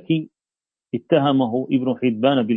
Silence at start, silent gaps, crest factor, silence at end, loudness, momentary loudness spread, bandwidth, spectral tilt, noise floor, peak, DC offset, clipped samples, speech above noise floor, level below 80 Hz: 0.1 s; none; 18 dB; 0 s; -20 LUFS; 13 LU; 3.9 kHz; -10 dB/octave; under -90 dBFS; -2 dBFS; under 0.1%; under 0.1%; over 71 dB; -66 dBFS